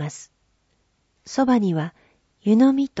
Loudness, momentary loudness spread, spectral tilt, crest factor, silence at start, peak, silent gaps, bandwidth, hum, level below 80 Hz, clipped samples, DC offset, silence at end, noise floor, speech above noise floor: -20 LUFS; 16 LU; -6.5 dB/octave; 16 dB; 0 s; -6 dBFS; none; 8 kHz; none; -64 dBFS; under 0.1%; under 0.1%; 0 s; -67 dBFS; 49 dB